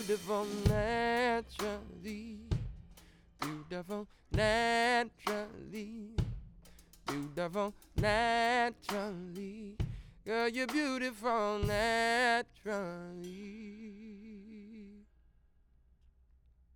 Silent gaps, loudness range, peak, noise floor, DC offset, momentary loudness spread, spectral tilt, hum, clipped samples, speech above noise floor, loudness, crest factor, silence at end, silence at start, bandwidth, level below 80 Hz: none; 10 LU; -16 dBFS; -67 dBFS; under 0.1%; 18 LU; -5 dB/octave; none; under 0.1%; 32 dB; -35 LUFS; 20 dB; 1.75 s; 0 s; over 20 kHz; -50 dBFS